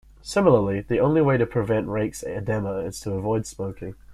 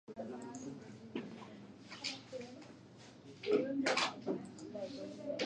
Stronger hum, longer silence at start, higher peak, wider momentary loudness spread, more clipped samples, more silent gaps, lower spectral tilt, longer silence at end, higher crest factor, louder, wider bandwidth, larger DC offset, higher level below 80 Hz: neither; first, 0.25 s vs 0.1 s; first, -4 dBFS vs -20 dBFS; second, 12 LU vs 20 LU; neither; neither; first, -7 dB/octave vs -3.5 dB/octave; about the same, 0 s vs 0 s; about the same, 18 dB vs 22 dB; first, -24 LUFS vs -41 LUFS; first, 14 kHz vs 10.5 kHz; neither; first, -48 dBFS vs -80 dBFS